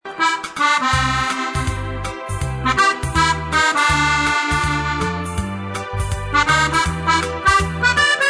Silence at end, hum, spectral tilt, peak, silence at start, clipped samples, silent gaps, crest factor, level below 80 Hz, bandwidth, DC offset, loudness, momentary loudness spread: 0 s; none; -3.5 dB/octave; -2 dBFS; 0.05 s; under 0.1%; none; 16 dB; -32 dBFS; 11 kHz; under 0.1%; -18 LUFS; 10 LU